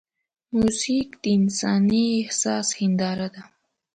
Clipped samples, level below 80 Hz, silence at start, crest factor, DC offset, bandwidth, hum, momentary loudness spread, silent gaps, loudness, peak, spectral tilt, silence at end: under 0.1%; -56 dBFS; 0.5 s; 14 dB; under 0.1%; 9.4 kHz; none; 7 LU; none; -23 LUFS; -10 dBFS; -4.5 dB/octave; 0.5 s